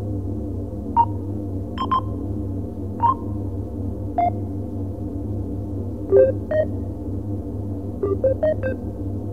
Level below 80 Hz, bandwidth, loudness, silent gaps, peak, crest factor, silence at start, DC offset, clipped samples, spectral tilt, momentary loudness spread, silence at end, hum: -36 dBFS; 5.6 kHz; -24 LUFS; none; -4 dBFS; 20 dB; 0 s; 0.9%; under 0.1%; -9.5 dB/octave; 9 LU; 0 s; none